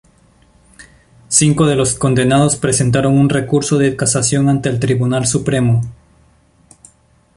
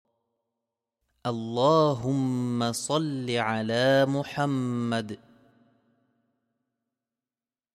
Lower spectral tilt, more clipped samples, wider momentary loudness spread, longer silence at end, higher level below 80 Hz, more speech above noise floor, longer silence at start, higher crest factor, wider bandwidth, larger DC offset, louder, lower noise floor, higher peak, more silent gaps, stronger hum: about the same, -5 dB/octave vs -5.5 dB/octave; neither; second, 4 LU vs 10 LU; second, 1.4 s vs 2.6 s; first, -42 dBFS vs -68 dBFS; second, 39 dB vs over 64 dB; second, 0.8 s vs 1.25 s; about the same, 16 dB vs 18 dB; second, 11.5 kHz vs 14.5 kHz; neither; first, -14 LUFS vs -26 LUFS; second, -52 dBFS vs under -90 dBFS; first, 0 dBFS vs -10 dBFS; neither; neither